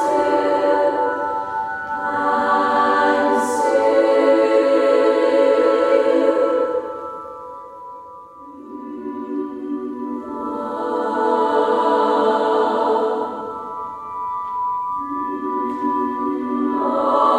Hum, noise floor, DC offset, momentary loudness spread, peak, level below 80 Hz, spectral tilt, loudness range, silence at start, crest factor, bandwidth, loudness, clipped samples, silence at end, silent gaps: none; -39 dBFS; under 0.1%; 16 LU; -4 dBFS; -62 dBFS; -4.5 dB/octave; 12 LU; 0 s; 16 dB; 12.5 kHz; -19 LUFS; under 0.1%; 0 s; none